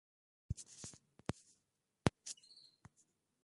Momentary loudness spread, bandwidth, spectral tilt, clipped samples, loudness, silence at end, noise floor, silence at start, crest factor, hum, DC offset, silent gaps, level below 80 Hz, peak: 21 LU; 11.5 kHz; -5 dB/octave; under 0.1%; -46 LUFS; 1.1 s; -85 dBFS; 0.5 s; 38 dB; none; under 0.1%; none; -60 dBFS; -10 dBFS